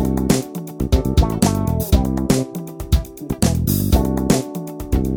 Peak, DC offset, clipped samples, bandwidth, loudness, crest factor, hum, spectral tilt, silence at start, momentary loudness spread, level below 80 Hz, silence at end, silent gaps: 0 dBFS; under 0.1%; under 0.1%; 19.5 kHz; -19 LUFS; 18 dB; none; -6 dB/octave; 0 s; 11 LU; -24 dBFS; 0 s; none